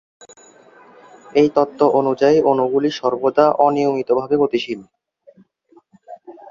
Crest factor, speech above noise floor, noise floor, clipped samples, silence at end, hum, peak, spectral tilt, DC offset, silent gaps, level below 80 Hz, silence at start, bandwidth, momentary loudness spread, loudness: 18 dB; 38 dB; -54 dBFS; under 0.1%; 0 s; none; -2 dBFS; -6.5 dB/octave; under 0.1%; none; -62 dBFS; 1.35 s; 7.4 kHz; 7 LU; -17 LUFS